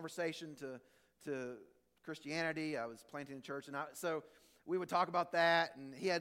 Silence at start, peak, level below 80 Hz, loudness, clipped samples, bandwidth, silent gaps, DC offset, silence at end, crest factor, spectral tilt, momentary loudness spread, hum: 0 s; -20 dBFS; -84 dBFS; -39 LUFS; under 0.1%; 16.5 kHz; none; under 0.1%; 0 s; 20 dB; -4.5 dB/octave; 17 LU; none